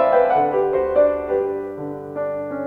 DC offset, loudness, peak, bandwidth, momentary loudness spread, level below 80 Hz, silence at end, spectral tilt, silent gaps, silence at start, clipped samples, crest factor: under 0.1%; -20 LUFS; -4 dBFS; 4.5 kHz; 12 LU; -50 dBFS; 0 s; -8.5 dB/octave; none; 0 s; under 0.1%; 14 dB